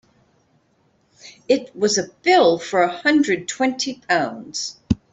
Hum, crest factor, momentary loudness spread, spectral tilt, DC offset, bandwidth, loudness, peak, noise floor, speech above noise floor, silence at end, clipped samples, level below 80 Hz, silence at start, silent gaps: none; 18 dB; 11 LU; -3.5 dB/octave; under 0.1%; 8.4 kHz; -20 LUFS; -4 dBFS; -62 dBFS; 43 dB; 0.15 s; under 0.1%; -48 dBFS; 1.25 s; none